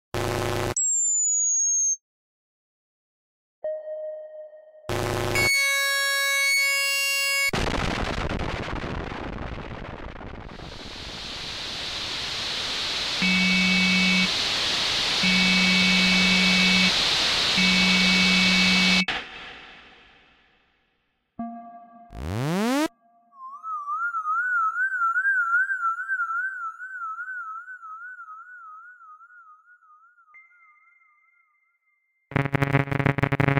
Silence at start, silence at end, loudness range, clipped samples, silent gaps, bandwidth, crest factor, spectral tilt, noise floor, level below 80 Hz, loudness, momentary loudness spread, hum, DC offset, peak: 0.15 s; 0 s; 16 LU; under 0.1%; 2.01-3.62 s; 16 kHz; 20 dB; -2.5 dB/octave; -72 dBFS; -44 dBFS; -21 LUFS; 21 LU; none; under 0.1%; -4 dBFS